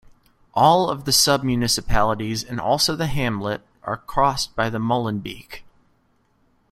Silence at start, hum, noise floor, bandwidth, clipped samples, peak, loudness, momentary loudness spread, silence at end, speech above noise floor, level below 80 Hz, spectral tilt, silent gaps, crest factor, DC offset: 0.55 s; none; -63 dBFS; 16 kHz; under 0.1%; -2 dBFS; -21 LUFS; 14 LU; 1.1 s; 42 dB; -40 dBFS; -3.5 dB/octave; none; 20 dB; under 0.1%